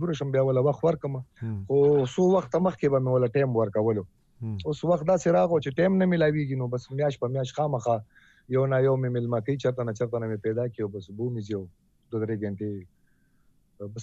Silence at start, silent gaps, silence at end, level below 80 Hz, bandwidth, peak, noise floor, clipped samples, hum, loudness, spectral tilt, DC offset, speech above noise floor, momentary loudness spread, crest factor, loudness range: 0 s; none; 0 s; -60 dBFS; 8 kHz; -12 dBFS; -64 dBFS; under 0.1%; none; -26 LUFS; -8 dB/octave; under 0.1%; 39 dB; 12 LU; 14 dB; 7 LU